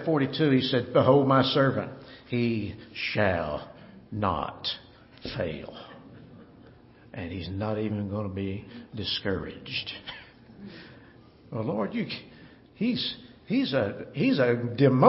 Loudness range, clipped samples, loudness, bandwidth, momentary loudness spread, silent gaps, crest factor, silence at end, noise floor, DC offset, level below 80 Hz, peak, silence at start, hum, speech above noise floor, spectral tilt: 10 LU; under 0.1%; -28 LUFS; 5.8 kHz; 20 LU; none; 24 dB; 0 s; -53 dBFS; under 0.1%; -56 dBFS; -4 dBFS; 0 s; none; 27 dB; -4.5 dB/octave